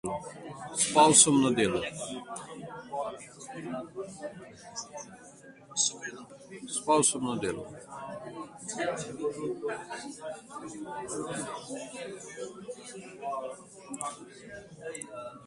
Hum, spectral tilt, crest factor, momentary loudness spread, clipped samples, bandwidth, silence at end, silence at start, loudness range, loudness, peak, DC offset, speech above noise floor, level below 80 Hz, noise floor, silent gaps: none; -2.5 dB/octave; 26 dB; 20 LU; under 0.1%; 11.5 kHz; 0 s; 0.05 s; 15 LU; -29 LUFS; -6 dBFS; under 0.1%; 21 dB; -66 dBFS; -52 dBFS; none